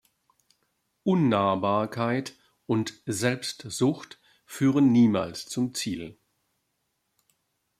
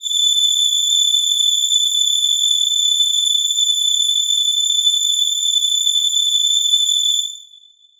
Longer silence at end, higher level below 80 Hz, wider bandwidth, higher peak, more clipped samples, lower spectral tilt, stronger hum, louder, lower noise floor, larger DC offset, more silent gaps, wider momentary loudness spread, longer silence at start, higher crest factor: first, 1.7 s vs 0.55 s; about the same, -68 dBFS vs -66 dBFS; second, 15 kHz vs over 20 kHz; second, -8 dBFS vs -4 dBFS; neither; first, -5.5 dB/octave vs 7.5 dB/octave; neither; second, -26 LUFS vs -13 LUFS; first, -77 dBFS vs -48 dBFS; neither; neither; first, 16 LU vs 2 LU; first, 1.05 s vs 0 s; first, 18 dB vs 12 dB